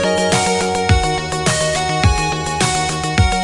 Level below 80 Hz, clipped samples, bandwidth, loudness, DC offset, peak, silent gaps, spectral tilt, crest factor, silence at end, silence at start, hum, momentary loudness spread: -26 dBFS; under 0.1%; 11.5 kHz; -16 LUFS; under 0.1%; 0 dBFS; none; -4 dB/octave; 16 dB; 0 s; 0 s; none; 3 LU